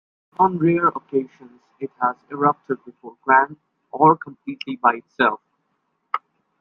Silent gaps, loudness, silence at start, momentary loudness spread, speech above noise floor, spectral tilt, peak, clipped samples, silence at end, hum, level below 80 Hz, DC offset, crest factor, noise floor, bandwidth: none; -21 LUFS; 0.4 s; 17 LU; 51 dB; -8.5 dB/octave; -2 dBFS; under 0.1%; 0.4 s; none; -68 dBFS; under 0.1%; 20 dB; -72 dBFS; 5.8 kHz